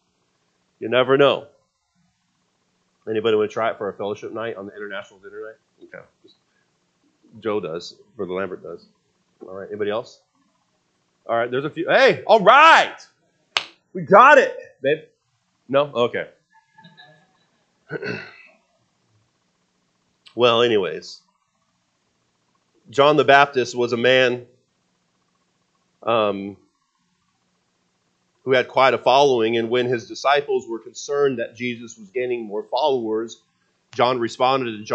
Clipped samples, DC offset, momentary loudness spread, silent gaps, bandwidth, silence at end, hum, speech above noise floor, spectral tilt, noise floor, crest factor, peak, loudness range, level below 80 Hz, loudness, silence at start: under 0.1%; under 0.1%; 20 LU; none; 8.6 kHz; 0 s; none; 50 dB; -4.5 dB/octave; -69 dBFS; 22 dB; 0 dBFS; 16 LU; -74 dBFS; -19 LUFS; 0.8 s